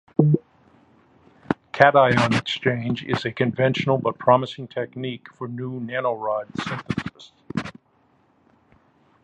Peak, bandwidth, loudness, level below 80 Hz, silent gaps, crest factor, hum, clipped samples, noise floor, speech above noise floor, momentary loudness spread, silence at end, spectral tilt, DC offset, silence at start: 0 dBFS; 11 kHz; -22 LUFS; -56 dBFS; none; 24 dB; none; under 0.1%; -62 dBFS; 40 dB; 15 LU; 1.55 s; -6.5 dB/octave; under 0.1%; 0.2 s